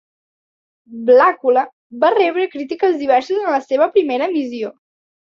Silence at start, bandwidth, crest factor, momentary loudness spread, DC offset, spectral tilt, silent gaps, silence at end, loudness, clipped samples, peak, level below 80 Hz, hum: 0.9 s; 7 kHz; 14 dB; 13 LU; under 0.1%; -5 dB/octave; 1.73-1.90 s; 0.7 s; -16 LUFS; under 0.1%; -2 dBFS; -68 dBFS; none